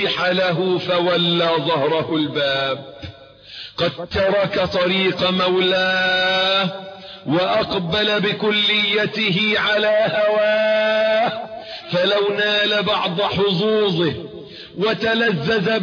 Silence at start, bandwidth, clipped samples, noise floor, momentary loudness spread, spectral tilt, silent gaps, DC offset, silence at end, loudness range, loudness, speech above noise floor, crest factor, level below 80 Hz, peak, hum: 0 s; 5.4 kHz; under 0.1%; -40 dBFS; 13 LU; -5.5 dB/octave; none; under 0.1%; 0 s; 4 LU; -18 LUFS; 22 dB; 12 dB; -52 dBFS; -6 dBFS; none